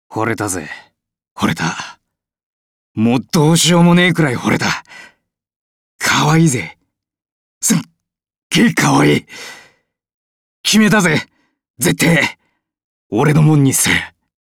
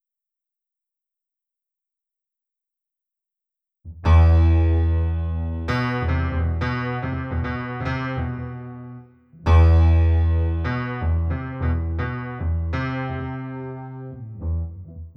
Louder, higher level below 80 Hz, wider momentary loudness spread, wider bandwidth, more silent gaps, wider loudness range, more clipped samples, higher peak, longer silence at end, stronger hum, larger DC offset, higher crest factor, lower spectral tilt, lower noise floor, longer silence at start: first, -14 LUFS vs -22 LUFS; second, -48 dBFS vs -26 dBFS; about the same, 18 LU vs 18 LU; first, 17 kHz vs 5.8 kHz; first, 1.31-1.36 s, 2.43-2.95 s, 5.56-5.99 s, 7.32-7.61 s, 8.38-8.50 s, 10.14-10.64 s, 11.70-11.74 s, 12.84-13.10 s vs none; second, 4 LU vs 7 LU; neither; first, -2 dBFS vs -6 dBFS; first, 0.3 s vs 0.05 s; neither; neither; about the same, 14 dB vs 16 dB; second, -4.5 dB/octave vs -9 dB/octave; second, -74 dBFS vs -87 dBFS; second, 0.1 s vs 3.85 s